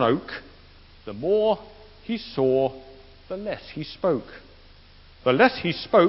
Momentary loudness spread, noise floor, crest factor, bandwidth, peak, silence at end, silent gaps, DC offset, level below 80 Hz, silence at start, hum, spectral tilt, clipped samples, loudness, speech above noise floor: 20 LU; -50 dBFS; 22 dB; 5.8 kHz; -4 dBFS; 0 s; none; under 0.1%; -52 dBFS; 0 s; none; -10 dB/octave; under 0.1%; -24 LUFS; 27 dB